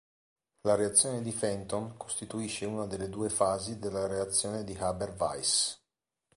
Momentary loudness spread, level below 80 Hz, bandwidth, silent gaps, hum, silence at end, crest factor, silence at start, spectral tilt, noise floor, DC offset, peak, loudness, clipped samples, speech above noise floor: 11 LU; -58 dBFS; 11.5 kHz; none; none; 0.6 s; 24 dB; 0.65 s; -3 dB/octave; -86 dBFS; under 0.1%; -10 dBFS; -31 LUFS; under 0.1%; 55 dB